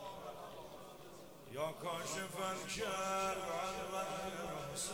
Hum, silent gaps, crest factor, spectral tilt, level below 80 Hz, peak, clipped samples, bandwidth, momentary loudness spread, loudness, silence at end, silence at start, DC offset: none; none; 16 dB; -3 dB/octave; -68 dBFS; -26 dBFS; under 0.1%; over 20 kHz; 15 LU; -42 LUFS; 0 s; 0 s; under 0.1%